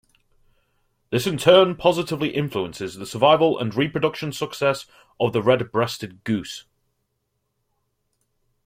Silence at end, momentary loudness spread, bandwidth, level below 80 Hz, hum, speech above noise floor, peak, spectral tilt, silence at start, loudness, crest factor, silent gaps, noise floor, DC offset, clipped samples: 2.05 s; 15 LU; 16 kHz; -58 dBFS; none; 54 dB; -2 dBFS; -5.5 dB/octave; 1.1 s; -21 LUFS; 20 dB; none; -75 dBFS; under 0.1%; under 0.1%